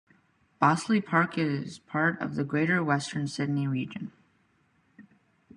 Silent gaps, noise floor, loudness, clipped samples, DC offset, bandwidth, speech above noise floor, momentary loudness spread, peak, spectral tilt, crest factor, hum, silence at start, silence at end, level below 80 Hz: none; -68 dBFS; -28 LUFS; under 0.1%; under 0.1%; 11.5 kHz; 40 dB; 9 LU; -8 dBFS; -6 dB/octave; 22 dB; none; 0.6 s; 0.55 s; -70 dBFS